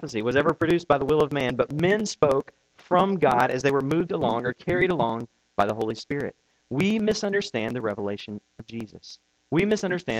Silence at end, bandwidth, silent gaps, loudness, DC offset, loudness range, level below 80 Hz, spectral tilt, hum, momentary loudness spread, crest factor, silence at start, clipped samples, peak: 0 s; 15.5 kHz; none; -24 LUFS; under 0.1%; 5 LU; -54 dBFS; -6 dB/octave; none; 14 LU; 20 dB; 0 s; under 0.1%; -6 dBFS